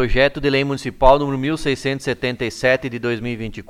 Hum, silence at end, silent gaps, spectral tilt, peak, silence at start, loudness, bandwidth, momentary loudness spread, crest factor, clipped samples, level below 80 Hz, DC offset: none; 0.05 s; none; -5.5 dB/octave; 0 dBFS; 0 s; -19 LUFS; 13.5 kHz; 9 LU; 18 dB; under 0.1%; -30 dBFS; under 0.1%